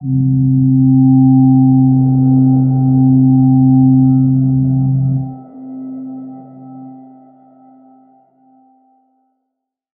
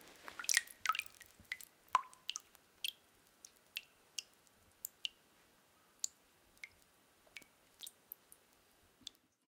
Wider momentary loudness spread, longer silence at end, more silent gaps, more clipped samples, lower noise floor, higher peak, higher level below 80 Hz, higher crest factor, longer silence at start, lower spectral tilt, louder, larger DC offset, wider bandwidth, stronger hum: second, 19 LU vs 23 LU; first, 3.05 s vs 1.6 s; neither; neither; first, -75 dBFS vs -71 dBFS; first, -2 dBFS vs -8 dBFS; first, -44 dBFS vs -84 dBFS; second, 12 dB vs 40 dB; about the same, 0 s vs 0 s; first, -17.5 dB/octave vs 2.5 dB/octave; first, -11 LUFS vs -42 LUFS; neither; second, 1.4 kHz vs 18 kHz; neither